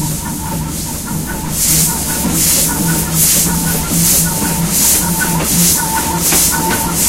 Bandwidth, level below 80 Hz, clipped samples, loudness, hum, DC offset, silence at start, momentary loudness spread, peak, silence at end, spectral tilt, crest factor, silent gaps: 17 kHz; -28 dBFS; under 0.1%; -12 LUFS; none; under 0.1%; 0 s; 10 LU; 0 dBFS; 0 s; -2.5 dB/octave; 14 dB; none